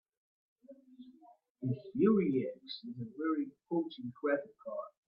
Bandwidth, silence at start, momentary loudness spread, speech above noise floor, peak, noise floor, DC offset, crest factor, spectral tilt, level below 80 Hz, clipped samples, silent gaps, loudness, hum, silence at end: 5.6 kHz; 0.7 s; 16 LU; 28 dB; -16 dBFS; -63 dBFS; under 0.1%; 20 dB; -10 dB/octave; -78 dBFS; under 0.1%; 1.50-1.55 s; -36 LUFS; none; 0.2 s